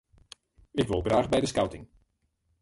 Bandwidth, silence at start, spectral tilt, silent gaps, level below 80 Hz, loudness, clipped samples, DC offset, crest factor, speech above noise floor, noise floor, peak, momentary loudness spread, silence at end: 11.5 kHz; 0.75 s; -5.5 dB/octave; none; -48 dBFS; -28 LUFS; under 0.1%; under 0.1%; 20 dB; 47 dB; -74 dBFS; -10 dBFS; 10 LU; 0.75 s